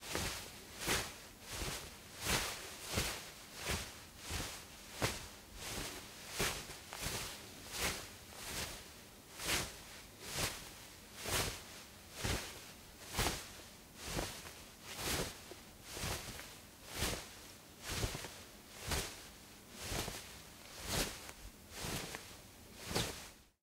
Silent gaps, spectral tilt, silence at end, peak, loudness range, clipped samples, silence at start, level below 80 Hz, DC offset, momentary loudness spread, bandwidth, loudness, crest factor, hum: none; -2.5 dB/octave; 0.15 s; -20 dBFS; 3 LU; under 0.1%; 0 s; -54 dBFS; under 0.1%; 15 LU; 16 kHz; -42 LUFS; 24 dB; none